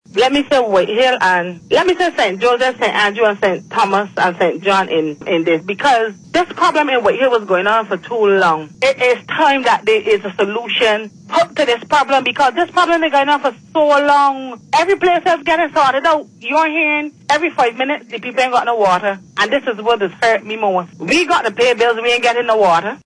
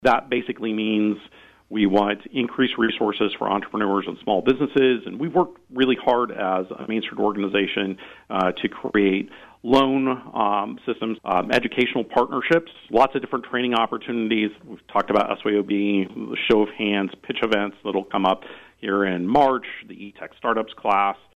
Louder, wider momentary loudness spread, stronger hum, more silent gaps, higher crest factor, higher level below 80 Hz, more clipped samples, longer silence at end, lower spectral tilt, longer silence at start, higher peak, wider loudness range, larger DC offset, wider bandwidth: first, -14 LUFS vs -22 LUFS; second, 5 LU vs 8 LU; neither; neither; about the same, 12 dB vs 16 dB; about the same, -54 dBFS vs -56 dBFS; neither; about the same, 0.1 s vs 0.2 s; second, -3.5 dB/octave vs -6.5 dB/octave; first, 0.15 s vs 0 s; first, -2 dBFS vs -6 dBFS; about the same, 2 LU vs 2 LU; neither; about the same, 10.5 kHz vs 9.8 kHz